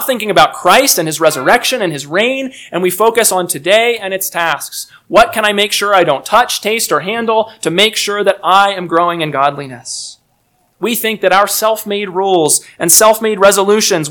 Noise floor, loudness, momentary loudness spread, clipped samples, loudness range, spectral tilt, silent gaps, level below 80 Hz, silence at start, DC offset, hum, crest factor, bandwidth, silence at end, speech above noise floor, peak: -58 dBFS; -11 LUFS; 9 LU; 0.9%; 4 LU; -2 dB/octave; none; -50 dBFS; 0 s; under 0.1%; none; 12 dB; over 20 kHz; 0 s; 46 dB; 0 dBFS